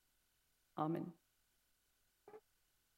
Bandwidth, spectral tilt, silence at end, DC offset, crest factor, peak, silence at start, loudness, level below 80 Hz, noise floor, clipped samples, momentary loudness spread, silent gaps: 16 kHz; -8.5 dB/octave; 0.6 s; under 0.1%; 24 dB; -26 dBFS; 0.75 s; -45 LUFS; -88 dBFS; -81 dBFS; under 0.1%; 21 LU; none